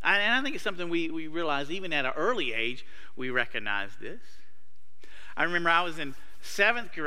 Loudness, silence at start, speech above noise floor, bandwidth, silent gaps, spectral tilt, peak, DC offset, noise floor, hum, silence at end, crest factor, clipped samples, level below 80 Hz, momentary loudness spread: -28 LUFS; 0.05 s; 38 dB; 16 kHz; none; -3.5 dB/octave; -8 dBFS; 3%; -68 dBFS; none; 0 s; 22 dB; under 0.1%; -64 dBFS; 16 LU